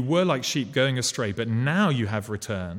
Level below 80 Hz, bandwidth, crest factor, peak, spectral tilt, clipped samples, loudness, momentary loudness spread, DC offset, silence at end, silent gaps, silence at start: -58 dBFS; 16.5 kHz; 16 dB; -8 dBFS; -5 dB/octave; under 0.1%; -25 LUFS; 7 LU; under 0.1%; 0 s; none; 0 s